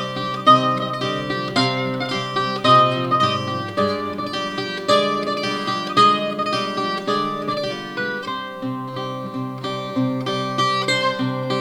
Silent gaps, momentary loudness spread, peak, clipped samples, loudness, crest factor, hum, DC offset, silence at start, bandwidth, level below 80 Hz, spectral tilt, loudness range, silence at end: none; 12 LU; -2 dBFS; under 0.1%; -20 LUFS; 20 dB; none; under 0.1%; 0 s; 18 kHz; -62 dBFS; -5 dB/octave; 7 LU; 0 s